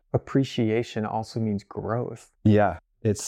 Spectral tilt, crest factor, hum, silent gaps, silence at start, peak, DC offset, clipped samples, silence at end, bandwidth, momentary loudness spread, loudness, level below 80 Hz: -6.5 dB/octave; 16 dB; none; none; 0.15 s; -8 dBFS; under 0.1%; under 0.1%; 0 s; 12.5 kHz; 9 LU; -26 LUFS; -56 dBFS